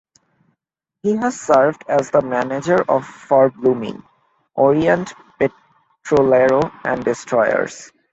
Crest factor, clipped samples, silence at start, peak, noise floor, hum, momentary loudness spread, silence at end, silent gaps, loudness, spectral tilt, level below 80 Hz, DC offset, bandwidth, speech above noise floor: 16 dB; under 0.1%; 1.05 s; -2 dBFS; -78 dBFS; none; 10 LU; 0.25 s; none; -17 LUFS; -6 dB/octave; -54 dBFS; under 0.1%; 8.2 kHz; 62 dB